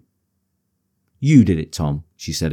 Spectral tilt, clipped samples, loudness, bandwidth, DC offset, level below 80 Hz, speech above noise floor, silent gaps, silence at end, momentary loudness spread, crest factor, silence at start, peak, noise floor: -6.5 dB/octave; under 0.1%; -18 LUFS; 15 kHz; under 0.1%; -40 dBFS; 54 dB; none; 0 s; 13 LU; 18 dB; 1.2 s; -2 dBFS; -71 dBFS